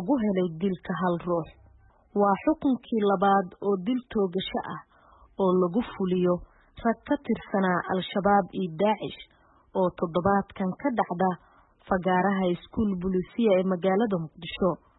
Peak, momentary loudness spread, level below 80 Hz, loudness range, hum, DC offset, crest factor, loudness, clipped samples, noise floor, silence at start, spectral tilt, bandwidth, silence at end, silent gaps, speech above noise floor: -10 dBFS; 8 LU; -54 dBFS; 2 LU; none; under 0.1%; 16 dB; -27 LUFS; under 0.1%; -57 dBFS; 0 s; -11 dB/octave; 4.1 kHz; 0.25 s; none; 31 dB